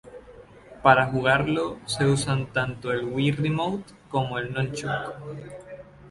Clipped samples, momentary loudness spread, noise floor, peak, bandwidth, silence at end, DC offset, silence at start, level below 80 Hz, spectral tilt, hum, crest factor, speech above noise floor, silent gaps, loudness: under 0.1%; 19 LU; -48 dBFS; -2 dBFS; 11.5 kHz; 0 s; under 0.1%; 0.05 s; -52 dBFS; -5.5 dB/octave; none; 24 dB; 23 dB; none; -25 LUFS